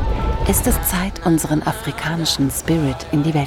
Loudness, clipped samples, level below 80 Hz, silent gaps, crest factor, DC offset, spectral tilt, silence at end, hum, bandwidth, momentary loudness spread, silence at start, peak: -19 LUFS; under 0.1%; -26 dBFS; none; 16 dB; under 0.1%; -4.5 dB/octave; 0 s; none; 18.5 kHz; 5 LU; 0 s; -2 dBFS